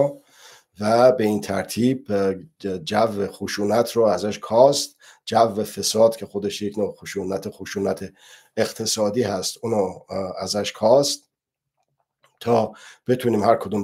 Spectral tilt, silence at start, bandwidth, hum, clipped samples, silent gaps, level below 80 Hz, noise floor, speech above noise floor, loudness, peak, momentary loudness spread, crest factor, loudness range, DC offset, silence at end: -4.5 dB/octave; 0 s; 16 kHz; none; under 0.1%; none; -64 dBFS; -83 dBFS; 62 dB; -22 LUFS; -2 dBFS; 13 LU; 20 dB; 5 LU; under 0.1%; 0 s